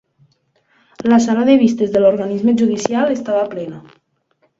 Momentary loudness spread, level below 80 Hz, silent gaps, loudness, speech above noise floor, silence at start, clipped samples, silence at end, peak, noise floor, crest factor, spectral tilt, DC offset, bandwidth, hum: 10 LU; -58 dBFS; none; -15 LUFS; 48 dB; 1 s; under 0.1%; 0.8 s; 0 dBFS; -62 dBFS; 16 dB; -6 dB/octave; under 0.1%; 7.8 kHz; none